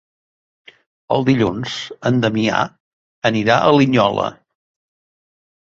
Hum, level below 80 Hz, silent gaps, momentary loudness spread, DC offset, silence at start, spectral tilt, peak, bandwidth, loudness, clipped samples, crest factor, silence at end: none; -52 dBFS; 2.80-3.22 s; 11 LU; under 0.1%; 1.1 s; -6 dB/octave; 0 dBFS; 7.8 kHz; -17 LUFS; under 0.1%; 18 dB; 1.45 s